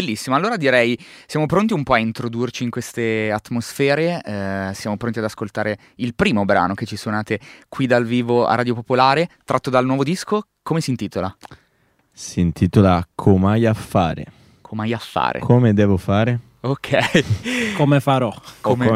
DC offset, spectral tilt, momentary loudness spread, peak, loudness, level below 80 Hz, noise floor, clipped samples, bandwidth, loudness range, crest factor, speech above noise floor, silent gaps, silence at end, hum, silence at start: under 0.1%; -6.5 dB/octave; 10 LU; 0 dBFS; -19 LUFS; -46 dBFS; -62 dBFS; under 0.1%; 15.5 kHz; 4 LU; 18 dB; 43 dB; none; 0 s; none; 0 s